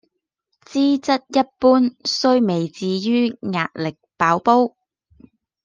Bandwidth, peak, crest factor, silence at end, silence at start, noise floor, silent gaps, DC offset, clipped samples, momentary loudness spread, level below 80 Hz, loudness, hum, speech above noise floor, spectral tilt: 7.6 kHz; -2 dBFS; 18 dB; 0.95 s; 0.7 s; -74 dBFS; none; under 0.1%; under 0.1%; 9 LU; -62 dBFS; -19 LUFS; none; 56 dB; -5.5 dB/octave